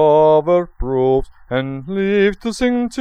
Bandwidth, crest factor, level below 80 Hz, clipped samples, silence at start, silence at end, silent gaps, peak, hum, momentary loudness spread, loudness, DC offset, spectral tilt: 11 kHz; 14 dB; -34 dBFS; under 0.1%; 0 s; 0 s; none; -2 dBFS; none; 10 LU; -17 LUFS; under 0.1%; -6.5 dB/octave